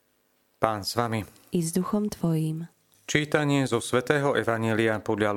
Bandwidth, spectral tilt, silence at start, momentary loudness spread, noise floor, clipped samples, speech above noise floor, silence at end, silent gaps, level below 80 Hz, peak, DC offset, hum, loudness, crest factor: 17 kHz; -5.5 dB/octave; 0.6 s; 8 LU; -69 dBFS; under 0.1%; 43 dB; 0 s; none; -60 dBFS; 0 dBFS; under 0.1%; none; -26 LUFS; 26 dB